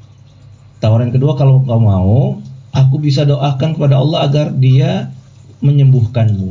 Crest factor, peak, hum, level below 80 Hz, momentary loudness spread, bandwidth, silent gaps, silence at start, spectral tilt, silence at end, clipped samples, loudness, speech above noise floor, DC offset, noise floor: 10 dB; -2 dBFS; none; -36 dBFS; 8 LU; 7.2 kHz; none; 0.8 s; -8.5 dB/octave; 0 s; under 0.1%; -12 LUFS; 29 dB; under 0.1%; -39 dBFS